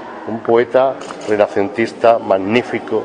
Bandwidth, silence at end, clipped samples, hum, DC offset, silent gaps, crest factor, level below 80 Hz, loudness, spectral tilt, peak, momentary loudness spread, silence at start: 10 kHz; 0 s; under 0.1%; none; under 0.1%; none; 16 dB; -56 dBFS; -15 LUFS; -6 dB/octave; 0 dBFS; 9 LU; 0 s